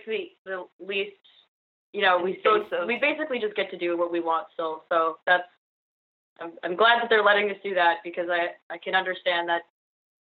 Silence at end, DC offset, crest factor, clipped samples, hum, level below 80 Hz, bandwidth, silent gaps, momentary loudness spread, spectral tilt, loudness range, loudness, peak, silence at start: 0.6 s; under 0.1%; 20 dB; under 0.1%; none; -82 dBFS; 4.7 kHz; 0.38-0.45 s, 0.73-0.79 s, 1.48-1.93 s, 5.58-6.36 s, 8.62-8.70 s; 16 LU; 0 dB/octave; 4 LU; -25 LUFS; -6 dBFS; 0.05 s